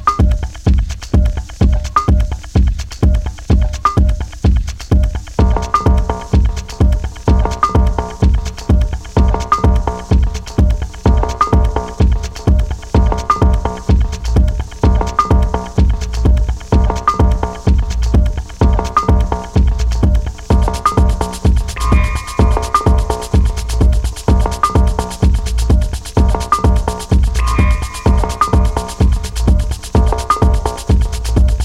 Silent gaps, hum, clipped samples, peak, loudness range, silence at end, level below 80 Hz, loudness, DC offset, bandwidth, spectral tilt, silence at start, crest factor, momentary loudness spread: none; none; under 0.1%; 0 dBFS; 1 LU; 0 s; -14 dBFS; -15 LUFS; under 0.1%; 12.5 kHz; -6.5 dB/octave; 0 s; 12 dB; 4 LU